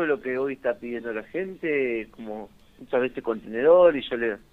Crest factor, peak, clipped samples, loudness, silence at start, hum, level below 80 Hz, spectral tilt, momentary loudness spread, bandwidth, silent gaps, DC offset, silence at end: 18 dB; -6 dBFS; under 0.1%; -25 LUFS; 0 s; none; -58 dBFS; -7 dB/octave; 15 LU; 4.2 kHz; none; under 0.1%; 0.15 s